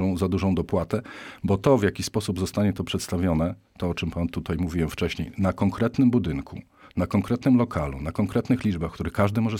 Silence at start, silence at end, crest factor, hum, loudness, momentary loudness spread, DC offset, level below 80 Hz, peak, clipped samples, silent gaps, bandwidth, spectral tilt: 0 s; 0 s; 18 dB; none; -25 LUFS; 9 LU; under 0.1%; -42 dBFS; -8 dBFS; under 0.1%; none; 16.5 kHz; -7 dB/octave